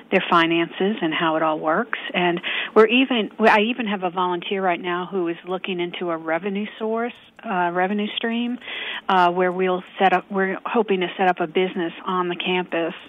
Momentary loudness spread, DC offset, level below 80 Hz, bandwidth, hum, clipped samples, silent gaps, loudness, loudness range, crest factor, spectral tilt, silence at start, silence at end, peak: 10 LU; under 0.1%; -72 dBFS; 7.8 kHz; none; under 0.1%; none; -21 LUFS; 5 LU; 18 dB; -7 dB/octave; 0 s; 0 s; -4 dBFS